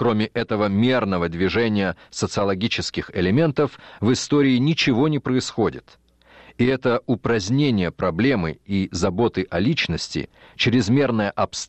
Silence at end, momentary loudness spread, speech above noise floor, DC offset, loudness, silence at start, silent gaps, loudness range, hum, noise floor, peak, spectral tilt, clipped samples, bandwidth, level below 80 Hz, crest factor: 0.05 s; 7 LU; 29 dB; under 0.1%; -21 LUFS; 0 s; none; 2 LU; none; -50 dBFS; -8 dBFS; -5.5 dB/octave; under 0.1%; 8.6 kHz; -48 dBFS; 14 dB